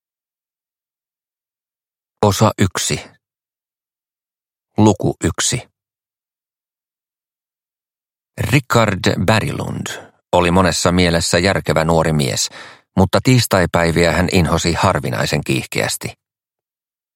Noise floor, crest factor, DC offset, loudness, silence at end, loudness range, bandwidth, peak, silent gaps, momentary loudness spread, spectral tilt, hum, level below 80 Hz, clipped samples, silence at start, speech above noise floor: under -90 dBFS; 18 dB; under 0.1%; -16 LUFS; 1.05 s; 6 LU; 16.5 kHz; 0 dBFS; none; 11 LU; -4.5 dB/octave; none; -40 dBFS; under 0.1%; 2.2 s; over 75 dB